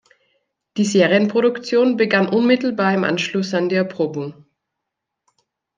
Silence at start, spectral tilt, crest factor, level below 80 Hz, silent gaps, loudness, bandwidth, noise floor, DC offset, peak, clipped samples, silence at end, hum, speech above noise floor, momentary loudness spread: 0.75 s; -5.5 dB/octave; 16 dB; -68 dBFS; none; -18 LUFS; 9.6 kHz; -81 dBFS; under 0.1%; -2 dBFS; under 0.1%; 1.45 s; none; 63 dB; 8 LU